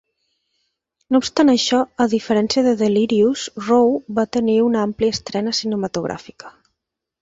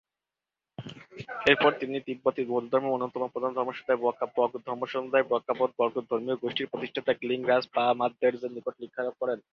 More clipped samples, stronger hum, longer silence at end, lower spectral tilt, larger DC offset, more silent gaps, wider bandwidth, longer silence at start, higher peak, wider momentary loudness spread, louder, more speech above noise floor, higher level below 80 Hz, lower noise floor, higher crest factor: neither; neither; first, 0.75 s vs 0.15 s; second, -4.5 dB/octave vs -6 dB/octave; neither; neither; first, 8 kHz vs 7.2 kHz; first, 1.1 s vs 0.8 s; about the same, -4 dBFS vs -6 dBFS; second, 8 LU vs 11 LU; first, -18 LUFS vs -28 LUFS; about the same, 62 dB vs 62 dB; first, -54 dBFS vs -70 dBFS; second, -80 dBFS vs -90 dBFS; second, 16 dB vs 24 dB